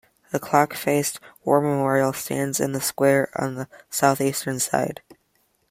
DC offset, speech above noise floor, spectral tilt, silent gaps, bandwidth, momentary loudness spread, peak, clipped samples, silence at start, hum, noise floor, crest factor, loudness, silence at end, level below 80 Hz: under 0.1%; 44 dB; -4.5 dB/octave; none; 16.5 kHz; 10 LU; -2 dBFS; under 0.1%; 0.3 s; none; -67 dBFS; 20 dB; -23 LUFS; 0.55 s; -64 dBFS